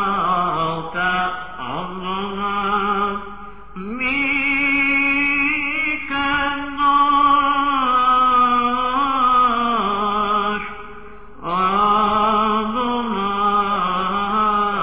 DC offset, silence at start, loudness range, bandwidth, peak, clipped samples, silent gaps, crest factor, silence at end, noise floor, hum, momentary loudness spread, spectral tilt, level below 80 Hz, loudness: 1%; 0 s; 6 LU; 4 kHz; -6 dBFS; under 0.1%; none; 14 dB; 0 s; -39 dBFS; none; 12 LU; -8 dB/octave; -46 dBFS; -18 LUFS